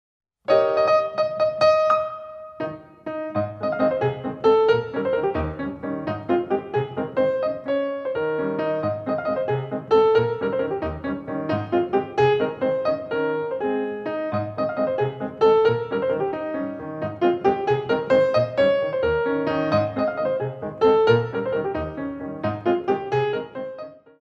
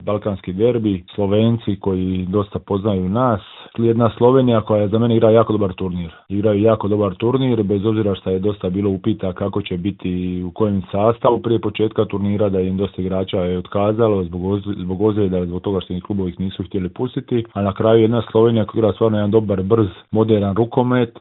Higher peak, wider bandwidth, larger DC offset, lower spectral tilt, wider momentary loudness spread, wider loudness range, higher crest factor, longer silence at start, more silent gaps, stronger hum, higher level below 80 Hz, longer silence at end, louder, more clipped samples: second, -4 dBFS vs 0 dBFS; first, 7 kHz vs 4.1 kHz; neither; second, -7.5 dB/octave vs -13 dB/octave; first, 11 LU vs 8 LU; about the same, 3 LU vs 4 LU; about the same, 18 dB vs 18 dB; first, 0.5 s vs 0 s; neither; neither; about the same, -50 dBFS vs -52 dBFS; first, 0.2 s vs 0 s; second, -23 LUFS vs -18 LUFS; neither